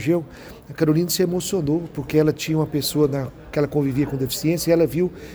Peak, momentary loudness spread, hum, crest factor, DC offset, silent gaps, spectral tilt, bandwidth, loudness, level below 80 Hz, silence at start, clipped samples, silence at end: -6 dBFS; 6 LU; none; 16 dB; under 0.1%; none; -5.5 dB/octave; over 20 kHz; -21 LUFS; -46 dBFS; 0 s; under 0.1%; 0 s